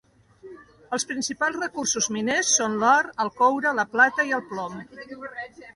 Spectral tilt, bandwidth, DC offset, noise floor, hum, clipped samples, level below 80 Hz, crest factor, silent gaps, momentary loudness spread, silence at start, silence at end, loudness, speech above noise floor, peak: -1.5 dB/octave; 11.5 kHz; under 0.1%; -48 dBFS; none; under 0.1%; -66 dBFS; 20 dB; none; 17 LU; 0.45 s; 0.05 s; -23 LUFS; 24 dB; -6 dBFS